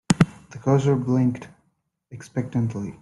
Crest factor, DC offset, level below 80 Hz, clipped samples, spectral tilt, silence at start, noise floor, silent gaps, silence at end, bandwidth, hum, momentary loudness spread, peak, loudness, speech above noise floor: 22 dB; under 0.1%; -52 dBFS; under 0.1%; -7 dB/octave; 0.1 s; -71 dBFS; none; 0.1 s; 11.5 kHz; none; 12 LU; -2 dBFS; -23 LUFS; 48 dB